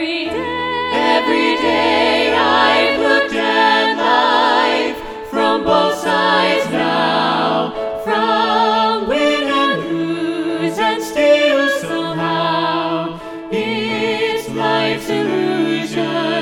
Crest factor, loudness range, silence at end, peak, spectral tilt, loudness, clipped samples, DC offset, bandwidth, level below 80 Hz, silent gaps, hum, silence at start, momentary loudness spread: 14 dB; 5 LU; 0 s; 0 dBFS; -4.5 dB/octave; -15 LUFS; under 0.1%; under 0.1%; 17 kHz; -50 dBFS; none; none; 0 s; 7 LU